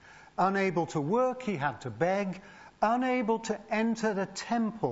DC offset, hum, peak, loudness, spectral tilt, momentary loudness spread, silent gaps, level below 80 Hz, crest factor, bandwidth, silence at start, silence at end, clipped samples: under 0.1%; none; -12 dBFS; -30 LUFS; -6 dB/octave; 6 LU; none; -68 dBFS; 18 dB; 8 kHz; 0.05 s; 0 s; under 0.1%